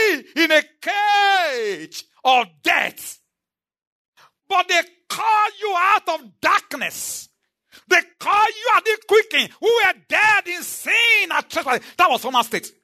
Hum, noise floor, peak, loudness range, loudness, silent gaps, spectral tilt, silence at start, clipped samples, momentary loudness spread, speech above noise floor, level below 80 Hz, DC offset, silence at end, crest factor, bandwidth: none; -88 dBFS; -2 dBFS; 5 LU; -18 LUFS; 3.87-4.13 s; -1 dB/octave; 0 s; under 0.1%; 11 LU; 69 dB; -70 dBFS; under 0.1%; 0.15 s; 18 dB; 13.5 kHz